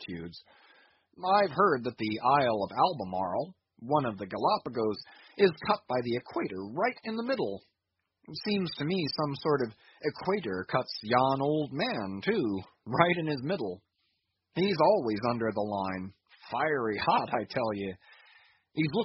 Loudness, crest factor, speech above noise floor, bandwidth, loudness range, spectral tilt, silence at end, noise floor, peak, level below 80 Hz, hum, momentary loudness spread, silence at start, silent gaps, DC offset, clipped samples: -30 LUFS; 24 dB; 54 dB; 5.8 kHz; 4 LU; -4 dB/octave; 0 s; -84 dBFS; -6 dBFS; -68 dBFS; none; 13 LU; 0 s; none; under 0.1%; under 0.1%